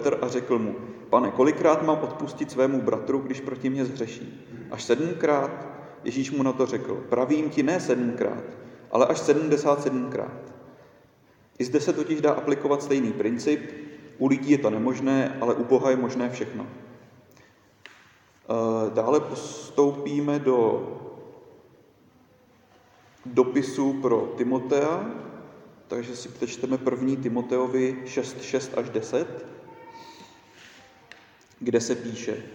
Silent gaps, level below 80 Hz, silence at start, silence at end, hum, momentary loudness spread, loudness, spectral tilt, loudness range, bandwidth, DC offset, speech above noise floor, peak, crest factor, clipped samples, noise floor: none; -72 dBFS; 0 s; 0 s; none; 17 LU; -25 LUFS; -6 dB/octave; 5 LU; 10.5 kHz; under 0.1%; 34 dB; -4 dBFS; 22 dB; under 0.1%; -58 dBFS